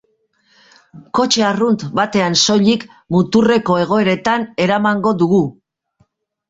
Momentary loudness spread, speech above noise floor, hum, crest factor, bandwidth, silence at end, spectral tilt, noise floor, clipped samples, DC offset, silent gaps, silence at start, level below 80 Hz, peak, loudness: 6 LU; 46 dB; none; 16 dB; 8 kHz; 1 s; -4.5 dB/octave; -61 dBFS; under 0.1%; under 0.1%; none; 0.95 s; -54 dBFS; 0 dBFS; -15 LUFS